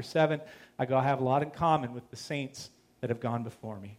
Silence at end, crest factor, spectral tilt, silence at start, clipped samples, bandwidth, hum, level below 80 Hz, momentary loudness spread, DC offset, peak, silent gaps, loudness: 0.05 s; 18 dB; -6.5 dB/octave; 0 s; under 0.1%; 15.5 kHz; none; -66 dBFS; 15 LU; under 0.1%; -12 dBFS; none; -31 LUFS